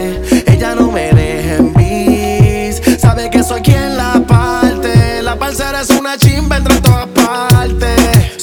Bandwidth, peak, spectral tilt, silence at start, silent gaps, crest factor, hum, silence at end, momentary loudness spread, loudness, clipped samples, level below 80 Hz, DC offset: over 20 kHz; 0 dBFS; -6 dB/octave; 0 s; none; 10 dB; none; 0 s; 4 LU; -11 LUFS; 0.3%; -20 dBFS; under 0.1%